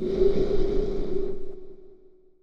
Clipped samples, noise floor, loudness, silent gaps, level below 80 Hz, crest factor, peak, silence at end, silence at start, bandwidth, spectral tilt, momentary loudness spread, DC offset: under 0.1%; -52 dBFS; -27 LUFS; none; -32 dBFS; 14 dB; -10 dBFS; 0.45 s; 0 s; 5.8 kHz; -8.5 dB/octave; 21 LU; under 0.1%